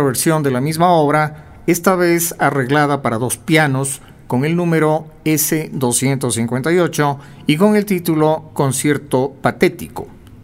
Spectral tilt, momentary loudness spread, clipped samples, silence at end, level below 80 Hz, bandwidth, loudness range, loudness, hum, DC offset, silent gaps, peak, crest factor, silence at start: -5 dB/octave; 7 LU; under 0.1%; 0.05 s; -48 dBFS; 16.5 kHz; 2 LU; -16 LUFS; none; under 0.1%; none; 0 dBFS; 16 dB; 0 s